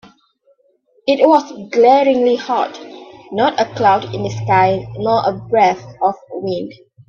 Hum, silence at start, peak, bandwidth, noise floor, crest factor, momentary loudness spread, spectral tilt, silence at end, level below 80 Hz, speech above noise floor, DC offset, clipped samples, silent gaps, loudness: none; 1.05 s; 0 dBFS; 7.2 kHz; -57 dBFS; 16 dB; 13 LU; -6 dB/octave; 0.35 s; -54 dBFS; 43 dB; under 0.1%; under 0.1%; none; -15 LUFS